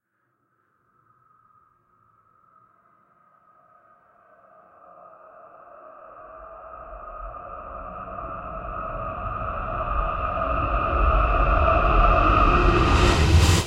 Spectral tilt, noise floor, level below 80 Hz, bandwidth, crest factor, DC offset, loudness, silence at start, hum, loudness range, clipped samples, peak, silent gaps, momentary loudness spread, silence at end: -5.5 dB/octave; -72 dBFS; -28 dBFS; 15 kHz; 18 dB; under 0.1%; -22 LUFS; 5.8 s; none; 24 LU; under 0.1%; -6 dBFS; none; 23 LU; 0 s